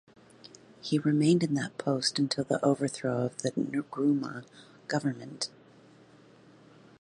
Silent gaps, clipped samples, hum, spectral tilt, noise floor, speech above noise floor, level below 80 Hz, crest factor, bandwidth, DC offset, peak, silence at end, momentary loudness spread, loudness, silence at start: none; under 0.1%; none; -5.5 dB/octave; -57 dBFS; 28 dB; -74 dBFS; 18 dB; 11 kHz; under 0.1%; -12 dBFS; 1.55 s; 12 LU; -30 LUFS; 0.85 s